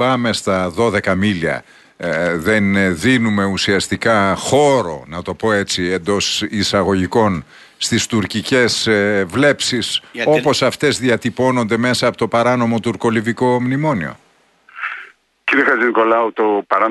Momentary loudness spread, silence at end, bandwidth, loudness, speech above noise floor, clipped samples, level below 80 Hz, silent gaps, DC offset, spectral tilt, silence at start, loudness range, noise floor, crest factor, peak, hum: 8 LU; 0 s; 12.5 kHz; -16 LUFS; 35 dB; under 0.1%; -50 dBFS; none; under 0.1%; -4.5 dB/octave; 0 s; 2 LU; -51 dBFS; 14 dB; -2 dBFS; none